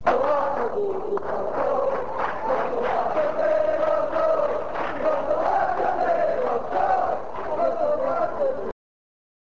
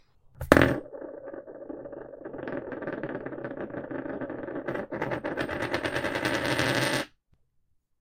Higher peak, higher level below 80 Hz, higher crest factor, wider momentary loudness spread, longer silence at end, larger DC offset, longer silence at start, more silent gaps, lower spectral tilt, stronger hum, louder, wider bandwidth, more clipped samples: second, -8 dBFS vs 0 dBFS; about the same, -54 dBFS vs -50 dBFS; second, 16 dB vs 30 dB; second, 5 LU vs 18 LU; about the same, 0.85 s vs 0.9 s; first, 2% vs under 0.1%; second, 0.05 s vs 0.35 s; neither; first, -6.5 dB/octave vs -5 dB/octave; neither; first, -24 LUFS vs -29 LUFS; second, 7.6 kHz vs 16 kHz; neither